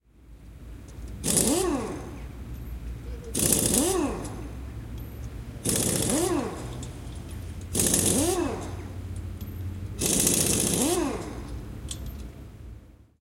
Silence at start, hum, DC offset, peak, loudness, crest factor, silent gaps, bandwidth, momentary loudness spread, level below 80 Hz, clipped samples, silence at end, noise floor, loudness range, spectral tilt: 0.2 s; none; under 0.1%; -4 dBFS; -25 LUFS; 24 dB; none; 17 kHz; 19 LU; -42 dBFS; under 0.1%; 0.2 s; -49 dBFS; 4 LU; -3.5 dB/octave